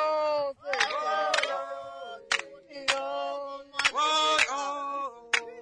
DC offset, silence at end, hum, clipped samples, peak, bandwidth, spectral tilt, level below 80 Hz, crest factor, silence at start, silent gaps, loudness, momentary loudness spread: under 0.1%; 0 s; none; under 0.1%; -10 dBFS; 11 kHz; 0.5 dB/octave; -70 dBFS; 20 dB; 0 s; none; -28 LUFS; 13 LU